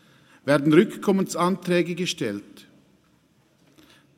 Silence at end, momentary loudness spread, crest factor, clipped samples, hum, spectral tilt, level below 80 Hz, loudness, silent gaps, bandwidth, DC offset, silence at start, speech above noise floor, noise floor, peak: 1.6 s; 12 LU; 20 dB; under 0.1%; none; -5.5 dB/octave; -70 dBFS; -23 LUFS; none; 16 kHz; under 0.1%; 0.45 s; 40 dB; -62 dBFS; -4 dBFS